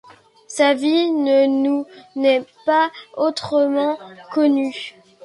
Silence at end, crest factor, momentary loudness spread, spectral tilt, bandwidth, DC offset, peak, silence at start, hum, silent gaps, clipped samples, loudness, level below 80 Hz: 0.35 s; 16 dB; 12 LU; -4 dB/octave; 11.5 kHz; under 0.1%; -4 dBFS; 0.5 s; none; none; under 0.1%; -19 LUFS; -68 dBFS